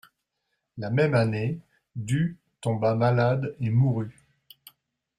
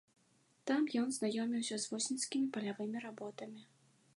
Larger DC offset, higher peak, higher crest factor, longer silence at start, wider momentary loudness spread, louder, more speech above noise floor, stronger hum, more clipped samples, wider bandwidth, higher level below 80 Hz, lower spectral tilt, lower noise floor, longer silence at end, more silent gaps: neither; first, -10 dBFS vs -22 dBFS; about the same, 16 dB vs 16 dB; about the same, 0.75 s vs 0.65 s; first, 16 LU vs 12 LU; first, -25 LUFS vs -38 LUFS; first, 55 dB vs 35 dB; neither; neither; about the same, 12.5 kHz vs 11.5 kHz; first, -60 dBFS vs under -90 dBFS; first, -8 dB/octave vs -3.5 dB/octave; first, -79 dBFS vs -73 dBFS; first, 1.05 s vs 0.55 s; neither